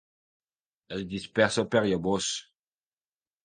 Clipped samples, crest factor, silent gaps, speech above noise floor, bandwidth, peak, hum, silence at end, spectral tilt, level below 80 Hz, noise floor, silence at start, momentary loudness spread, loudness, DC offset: under 0.1%; 24 dB; none; over 63 dB; 10 kHz; -6 dBFS; none; 1.05 s; -4 dB/octave; -60 dBFS; under -90 dBFS; 0.9 s; 12 LU; -28 LUFS; under 0.1%